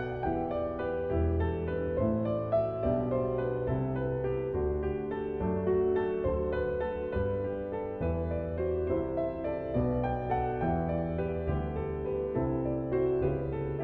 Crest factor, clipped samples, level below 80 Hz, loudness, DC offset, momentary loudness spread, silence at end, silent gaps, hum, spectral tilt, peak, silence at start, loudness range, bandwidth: 14 dB; under 0.1%; -42 dBFS; -32 LUFS; under 0.1%; 4 LU; 0 s; none; none; -11.5 dB/octave; -16 dBFS; 0 s; 2 LU; 4.3 kHz